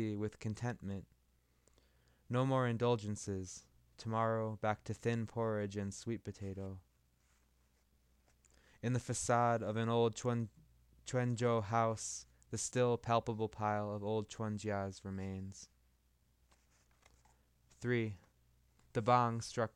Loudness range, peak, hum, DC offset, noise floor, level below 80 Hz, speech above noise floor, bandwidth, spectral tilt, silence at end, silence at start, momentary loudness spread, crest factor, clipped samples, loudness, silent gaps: 9 LU; -18 dBFS; none; under 0.1%; -74 dBFS; -68 dBFS; 37 dB; 12 kHz; -5.5 dB/octave; 0.05 s; 0 s; 13 LU; 22 dB; under 0.1%; -38 LUFS; none